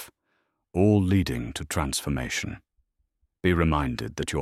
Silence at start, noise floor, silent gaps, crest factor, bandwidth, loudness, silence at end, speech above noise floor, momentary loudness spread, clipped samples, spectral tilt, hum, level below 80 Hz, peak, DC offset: 0 s; -74 dBFS; none; 18 dB; 15.5 kHz; -26 LUFS; 0 s; 49 dB; 11 LU; under 0.1%; -5.5 dB/octave; none; -40 dBFS; -8 dBFS; under 0.1%